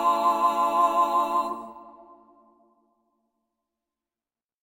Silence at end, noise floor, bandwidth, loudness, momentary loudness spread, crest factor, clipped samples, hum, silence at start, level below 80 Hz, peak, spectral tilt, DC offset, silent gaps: 2.7 s; under -90 dBFS; 16.5 kHz; -23 LUFS; 13 LU; 18 dB; under 0.1%; none; 0 s; -70 dBFS; -10 dBFS; -3 dB/octave; under 0.1%; none